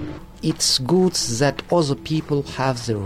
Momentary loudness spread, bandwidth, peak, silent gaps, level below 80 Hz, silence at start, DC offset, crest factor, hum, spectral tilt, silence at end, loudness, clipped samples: 8 LU; 16 kHz; -8 dBFS; none; -44 dBFS; 0 s; under 0.1%; 14 dB; none; -4.5 dB/octave; 0 s; -20 LUFS; under 0.1%